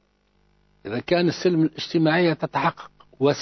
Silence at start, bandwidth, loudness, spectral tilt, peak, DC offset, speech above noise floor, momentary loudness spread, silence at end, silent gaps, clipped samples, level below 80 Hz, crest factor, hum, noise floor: 0.85 s; 6.4 kHz; -22 LUFS; -6.5 dB/octave; -8 dBFS; under 0.1%; 43 dB; 12 LU; 0 s; none; under 0.1%; -60 dBFS; 16 dB; 50 Hz at -50 dBFS; -64 dBFS